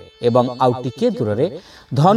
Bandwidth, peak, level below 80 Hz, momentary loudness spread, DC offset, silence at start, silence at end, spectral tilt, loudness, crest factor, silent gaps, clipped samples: 12 kHz; 0 dBFS; -56 dBFS; 7 LU; under 0.1%; 0 s; 0 s; -8 dB/octave; -19 LUFS; 18 dB; none; under 0.1%